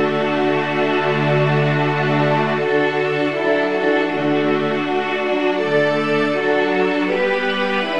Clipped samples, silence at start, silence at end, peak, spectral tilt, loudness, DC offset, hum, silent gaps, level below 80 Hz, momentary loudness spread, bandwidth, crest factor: under 0.1%; 0 s; 0 s; -4 dBFS; -7 dB/octave; -18 LUFS; 0.9%; none; none; -60 dBFS; 2 LU; 9.4 kHz; 14 dB